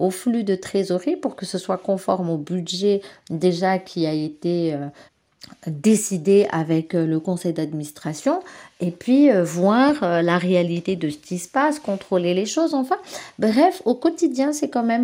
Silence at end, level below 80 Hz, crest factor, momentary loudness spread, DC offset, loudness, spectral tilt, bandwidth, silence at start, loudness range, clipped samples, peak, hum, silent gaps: 0 s; -68 dBFS; 16 dB; 10 LU; under 0.1%; -21 LUFS; -5.5 dB/octave; 16 kHz; 0 s; 4 LU; under 0.1%; -4 dBFS; none; none